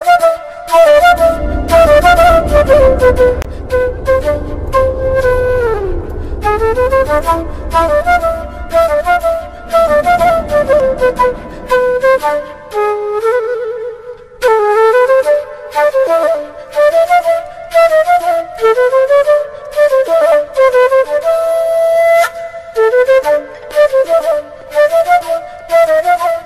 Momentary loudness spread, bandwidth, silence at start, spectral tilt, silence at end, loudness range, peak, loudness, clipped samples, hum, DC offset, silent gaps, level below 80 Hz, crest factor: 10 LU; 15.5 kHz; 0 s; -5 dB/octave; 0 s; 4 LU; 0 dBFS; -11 LUFS; under 0.1%; none; under 0.1%; none; -26 dBFS; 10 dB